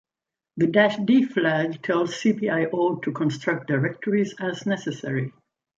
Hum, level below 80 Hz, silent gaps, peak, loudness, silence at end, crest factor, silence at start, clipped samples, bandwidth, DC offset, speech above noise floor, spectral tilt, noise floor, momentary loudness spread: none; -68 dBFS; none; -4 dBFS; -23 LUFS; 0.5 s; 20 dB; 0.55 s; under 0.1%; 7.8 kHz; under 0.1%; 66 dB; -6.5 dB/octave; -89 dBFS; 9 LU